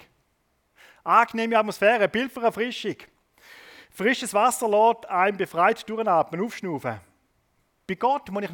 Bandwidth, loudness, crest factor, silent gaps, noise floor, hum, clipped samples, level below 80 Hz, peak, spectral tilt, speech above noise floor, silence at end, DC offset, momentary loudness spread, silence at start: 18 kHz; -23 LUFS; 20 dB; none; -70 dBFS; none; under 0.1%; -68 dBFS; -4 dBFS; -4 dB/octave; 47 dB; 0 s; under 0.1%; 12 LU; 1.05 s